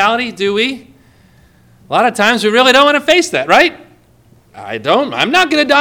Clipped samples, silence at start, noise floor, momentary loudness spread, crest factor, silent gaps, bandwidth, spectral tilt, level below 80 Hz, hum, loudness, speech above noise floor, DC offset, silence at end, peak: 0.2%; 0 s; -48 dBFS; 9 LU; 14 dB; none; over 20 kHz; -3 dB/octave; -52 dBFS; none; -11 LUFS; 36 dB; under 0.1%; 0 s; 0 dBFS